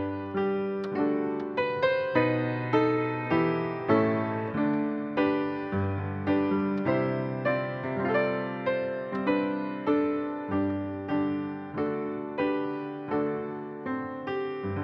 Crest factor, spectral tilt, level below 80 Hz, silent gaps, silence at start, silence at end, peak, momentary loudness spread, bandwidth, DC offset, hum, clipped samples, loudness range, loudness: 18 dB; -9 dB/octave; -68 dBFS; none; 0 s; 0 s; -10 dBFS; 7 LU; 5.8 kHz; under 0.1%; none; under 0.1%; 4 LU; -29 LUFS